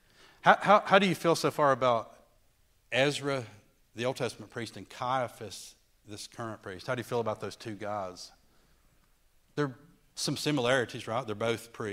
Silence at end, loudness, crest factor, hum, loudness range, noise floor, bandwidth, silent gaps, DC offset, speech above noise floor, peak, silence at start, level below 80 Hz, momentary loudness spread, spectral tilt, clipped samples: 0 s; -30 LUFS; 26 dB; none; 11 LU; -66 dBFS; 16 kHz; none; under 0.1%; 37 dB; -4 dBFS; 0.45 s; -68 dBFS; 20 LU; -4.5 dB/octave; under 0.1%